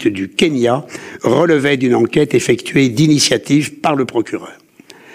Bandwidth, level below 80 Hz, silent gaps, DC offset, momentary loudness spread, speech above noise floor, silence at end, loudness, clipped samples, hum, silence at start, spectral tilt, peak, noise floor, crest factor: 15.5 kHz; -52 dBFS; none; under 0.1%; 8 LU; 28 dB; 0.6 s; -14 LUFS; under 0.1%; none; 0 s; -5 dB/octave; -2 dBFS; -42 dBFS; 12 dB